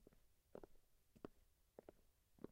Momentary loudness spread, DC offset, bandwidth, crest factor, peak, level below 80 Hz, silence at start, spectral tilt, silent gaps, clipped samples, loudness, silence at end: 6 LU; under 0.1%; 15.5 kHz; 28 dB; -38 dBFS; -76 dBFS; 0 s; -6.5 dB/octave; none; under 0.1%; -65 LUFS; 0 s